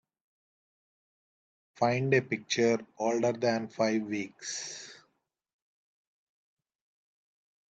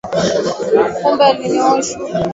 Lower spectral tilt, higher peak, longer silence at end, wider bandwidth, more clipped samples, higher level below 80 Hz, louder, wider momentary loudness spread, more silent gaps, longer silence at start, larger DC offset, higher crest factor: about the same, -4.5 dB/octave vs -4.5 dB/octave; second, -12 dBFS vs 0 dBFS; first, 2.75 s vs 0 s; first, 9 kHz vs 8 kHz; neither; second, -78 dBFS vs -48 dBFS; second, -30 LUFS vs -15 LUFS; first, 10 LU vs 6 LU; neither; first, 1.8 s vs 0.05 s; neither; first, 22 dB vs 14 dB